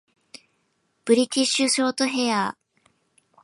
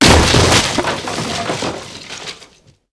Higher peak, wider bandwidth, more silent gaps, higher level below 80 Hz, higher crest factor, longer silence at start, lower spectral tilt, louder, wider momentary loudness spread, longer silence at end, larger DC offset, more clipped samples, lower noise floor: second, -6 dBFS vs 0 dBFS; about the same, 11.5 kHz vs 11 kHz; neither; second, -78 dBFS vs -26 dBFS; about the same, 20 dB vs 16 dB; first, 1.05 s vs 0 s; about the same, -2.5 dB/octave vs -3.5 dB/octave; second, -22 LUFS vs -14 LUFS; second, 7 LU vs 19 LU; first, 0.9 s vs 0.5 s; neither; neither; first, -70 dBFS vs -46 dBFS